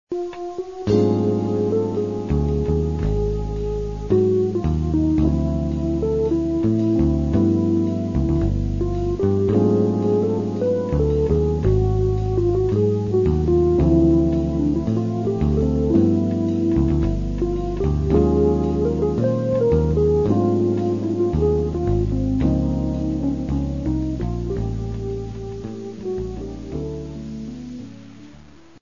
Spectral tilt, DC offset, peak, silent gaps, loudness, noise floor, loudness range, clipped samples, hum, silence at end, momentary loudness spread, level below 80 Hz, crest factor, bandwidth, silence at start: -10 dB/octave; 0.4%; -4 dBFS; none; -21 LUFS; -46 dBFS; 7 LU; under 0.1%; none; 0.4 s; 11 LU; -28 dBFS; 16 dB; 7.4 kHz; 0.1 s